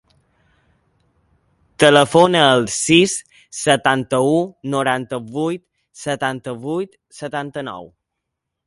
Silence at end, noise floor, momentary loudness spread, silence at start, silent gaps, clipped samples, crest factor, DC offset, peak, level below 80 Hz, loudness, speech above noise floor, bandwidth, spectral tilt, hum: 0.8 s; -79 dBFS; 18 LU; 1.8 s; none; under 0.1%; 20 dB; under 0.1%; 0 dBFS; -56 dBFS; -17 LUFS; 62 dB; 11.5 kHz; -4 dB/octave; none